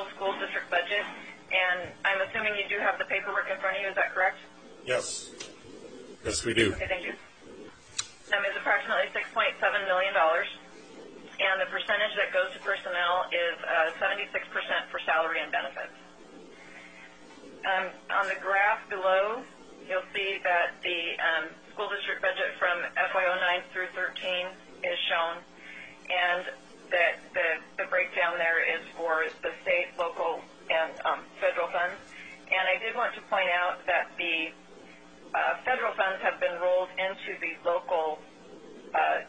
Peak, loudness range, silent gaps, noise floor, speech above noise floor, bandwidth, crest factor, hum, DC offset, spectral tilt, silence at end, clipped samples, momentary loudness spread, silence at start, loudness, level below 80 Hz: -10 dBFS; 4 LU; none; -51 dBFS; 22 dB; 9.4 kHz; 20 dB; none; 0.1%; -2.5 dB/octave; 0 s; under 0.1%; 17 LU; 0 s; -28 LUFS; -62 dBFS